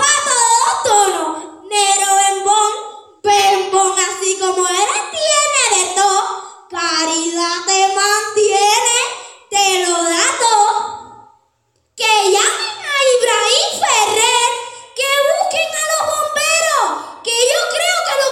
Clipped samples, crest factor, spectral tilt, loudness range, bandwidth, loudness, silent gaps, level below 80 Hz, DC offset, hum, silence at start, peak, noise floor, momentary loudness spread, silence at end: under 0.1%; 16 dB; 1 dB/octave; 2 LU; 17 kHz; -14 LUFS; none; -64 dBFS; under 0.1%; none; 0 s; 0 dBFS; -63 dBFS; 9 LU; 0 s